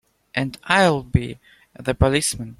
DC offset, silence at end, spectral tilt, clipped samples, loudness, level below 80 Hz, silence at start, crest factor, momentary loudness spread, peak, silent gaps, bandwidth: under 0.1%; 0.05 s; -4.5 dB/octave; under 0.1%; -20 LUFS; -36 dBFS; 0.35 s; 20 dB; 12 LU; -2 dBFS; none; 15.5 kHz